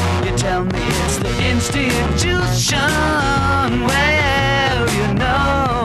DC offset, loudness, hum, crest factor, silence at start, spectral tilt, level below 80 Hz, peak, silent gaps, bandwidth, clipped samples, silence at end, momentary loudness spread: under 0.1%; -16 LUFS; none; 12 dB; 0 s; -4.5 dB/octave; -28 dBFS; -4 dBFS; none; 14 kHz; under 0.1%; 0 s; 4 LU